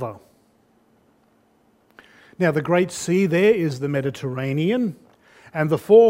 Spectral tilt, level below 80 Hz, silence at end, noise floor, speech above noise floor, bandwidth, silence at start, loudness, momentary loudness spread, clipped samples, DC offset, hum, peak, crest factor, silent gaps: -6.5 dB/octave; -64 dBFS; 0 s; -60 dBFS; 41 dB; 16 kHz; 0 s; -21 LUFS; 10 LU; under 0.1%; under 0.1%; none; -4 dBFS; 18 dB; none